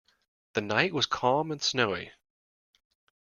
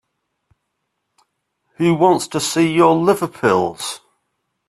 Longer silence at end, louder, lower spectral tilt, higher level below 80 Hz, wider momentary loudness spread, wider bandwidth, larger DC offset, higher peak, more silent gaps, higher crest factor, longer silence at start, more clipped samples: first, 1.1 s vs 0.7 s; second, -28 LUFS vs -16 LUFS; second, -3.5 dB/octave vs -5 dB/octave; second, -68 dBFS vs -60 dBFS; about the same, 10 LU vs 12 LU; second, 7.4 kHz vs 13.5 kHz; neither; second, -6 dBFS vs 0 dBFS; neither; first, 24 dB vs 18 dB; second, 0.55 s vs 1.8 s; neither